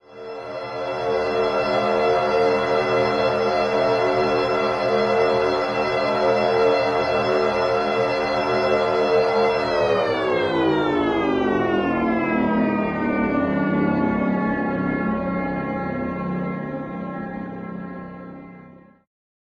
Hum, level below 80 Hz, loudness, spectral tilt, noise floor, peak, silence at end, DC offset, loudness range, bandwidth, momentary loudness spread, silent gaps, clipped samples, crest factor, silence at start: none; -50 dBFS; -21 LUFS; -6.5 dB/octave; -46 dBFS; -6 dBFS; 0.7 s; under 0.1%; 6 LU; 10.5 kHz; 11 LU; none; under 0.1%; 14 dB; 0.1 s